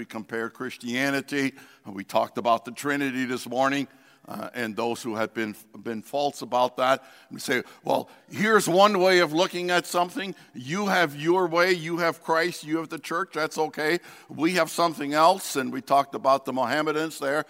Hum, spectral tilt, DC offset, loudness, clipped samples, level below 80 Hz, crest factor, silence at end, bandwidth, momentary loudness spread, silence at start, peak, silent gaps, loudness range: none; -4 dB/octave; under 0.1%; -25 LUFS; under 0.1%; -76 dBFS; 20 dB; 0.05 s; 16 kHz; 13 LU; 0 s; -4 dBFS; none; 5 LU